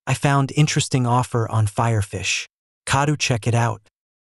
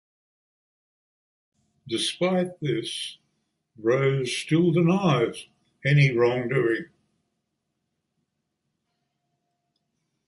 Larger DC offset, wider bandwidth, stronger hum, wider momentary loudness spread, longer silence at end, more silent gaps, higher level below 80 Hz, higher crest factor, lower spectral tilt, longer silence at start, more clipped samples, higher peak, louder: neither; about the same, 12 kHz vs 11.5 kHz; neither; second, 6 LU vs 11 LU; second, 0.45 s vs 3.4 s; first, 2.53-2.82 s vs none; first, -50 dBFS vs -66 dBFS; about the same, 18 dB vs 18 dB; about the same, -5 dB/octave vs -6 dB/octave; second, 0.05 s vs 1.85 s; neither; first, -4 dBFS vs -8 dBFS; first, -20 LUFS vs -24 LUFS